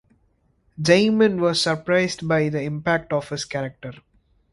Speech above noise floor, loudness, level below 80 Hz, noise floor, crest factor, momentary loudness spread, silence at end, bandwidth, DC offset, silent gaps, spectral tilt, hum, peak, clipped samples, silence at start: 43 dB; -21 LUFS; -56 dBFS; -64 dBFS; 20 dB; 12 LU; 0.6 s; 11.5 kHz; under 0.1%; none; -5 dB/octave; none; -2 dBFS; under 0.1%; 0.8 s